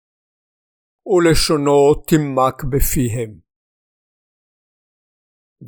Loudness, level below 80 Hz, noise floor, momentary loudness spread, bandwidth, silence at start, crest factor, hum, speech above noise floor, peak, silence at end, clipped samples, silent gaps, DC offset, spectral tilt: -16 LUFS; -30 dBFS; under -90 dBFS; 8 LU; over 20 kHz; 1.05 s; 18 dB; none; over 75 dB; -2 dBFS; 0 s; under 0.1%; 3.56-5.56 s; under 0.1%; -5 dB/octave